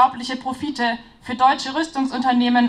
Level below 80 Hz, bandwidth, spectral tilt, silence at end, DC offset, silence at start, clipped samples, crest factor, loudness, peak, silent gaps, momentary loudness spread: -56 dBFS; 10.5 kHz; -3.5 dB/octave; 0 s; under 0.1%; 0 s; under 0.1%; 16 dB; -21 LUFS; -2 dBFS; none; 9 LU